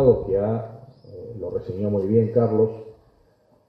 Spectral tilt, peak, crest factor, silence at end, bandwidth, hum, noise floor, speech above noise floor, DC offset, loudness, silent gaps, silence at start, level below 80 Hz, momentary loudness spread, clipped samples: -12 dB/octave; -4 dBFS; 20 dB; 0.75 s; 5.2 kHz; none; -60 dBFS; 38 dB; under 0.1%; -23 LUFS; none; 0 s; -48 dBFS; 20 LU; under 0.1%